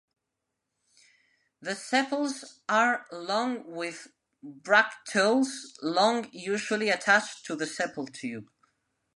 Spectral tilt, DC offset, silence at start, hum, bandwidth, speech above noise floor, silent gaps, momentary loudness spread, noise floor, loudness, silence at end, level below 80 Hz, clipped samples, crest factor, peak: -3 dB/octave; under 0.1%; 1.6 s; none; 11.5 kHz; 56 dB; none; 15 LU; -84 dBFS; -28 LUFS; 0.75 s; -82 dBFS; under 0.1%; 24 dB; -6 dBFS